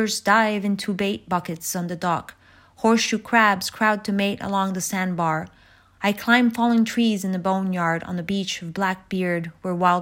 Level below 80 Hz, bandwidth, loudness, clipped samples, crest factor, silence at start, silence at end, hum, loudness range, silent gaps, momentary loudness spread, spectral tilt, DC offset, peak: -60 dBFS; 16.5 kHz; -22 LUFS; under 0.1%; 20 dB; 0 s; 0 s; none; 1 LU; none; 9 LU; -4.5 dB/octave; under 0.1%; -2 dBFS